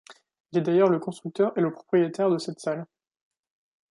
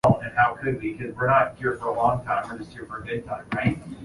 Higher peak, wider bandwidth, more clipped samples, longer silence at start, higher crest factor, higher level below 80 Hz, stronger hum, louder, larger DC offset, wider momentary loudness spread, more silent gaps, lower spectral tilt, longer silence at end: about the same, -8 dBFS vs -6 dBFS; about the same, 11 kHz vs 11.5 kHz; neither; about the same, 0.1 s vs 0.05 s; about the same, 18 dB vs 18 dB; second, -76 dBFS vs -50 dBFS; neither; about the same, -25 LUFS vs -25 LUFS; neither; about the same, 11 LU vs 13 LU; first, 0.40-0.44 s vs none; about the same, -7 dB/octave vs -7.5 dB/octave; first, 1.05 s vs 0 s